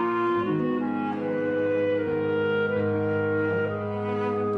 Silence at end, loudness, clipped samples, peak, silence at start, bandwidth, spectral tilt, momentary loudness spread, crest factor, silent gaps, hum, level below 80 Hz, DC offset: 0 s; -26 LUFS; under 0.1%; -16 dBFS; 0 s; 5.4 kHz; -9 dB/octave; 3 LU; 10 dB; none; none; -64 dBFS; under 0.1%